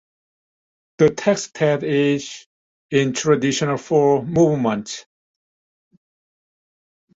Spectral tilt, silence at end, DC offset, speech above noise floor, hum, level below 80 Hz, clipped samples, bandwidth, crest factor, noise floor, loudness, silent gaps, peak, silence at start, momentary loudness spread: -5.5 dB/octave; 2.2 s; under 0.1%; over 72 dB; none; -58 dBFS; under 0.1%; 8 kHz; 18 dB; under -90 dBFS; -19 LUFS; 2.46-2.89 s; -2 dBFS; 1 s; 10 LU